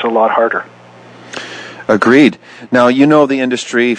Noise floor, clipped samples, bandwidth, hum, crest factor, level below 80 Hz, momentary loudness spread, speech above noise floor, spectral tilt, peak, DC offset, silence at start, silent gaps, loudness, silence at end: -38 dBFS; 0.1%; 9.8 kHz; none; 12 dB; -58 dBFS; 18 LU; 27 dB; -5.5 dB/octave; 0 dBFS; under 0.1%; 0 s; none; -11 LUFS; 0 s